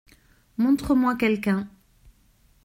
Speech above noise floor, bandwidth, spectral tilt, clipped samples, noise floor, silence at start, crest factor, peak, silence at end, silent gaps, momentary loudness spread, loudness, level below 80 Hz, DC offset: 38 dB; 16 kHz; -6.5 dB/octave; under 0.1%; -60 dBFS; 0.6 s; 16 dB; -10 dBFS; 0.95 s; none; 14 LU; -23 LUFS; -50 dBFS; under 0.1%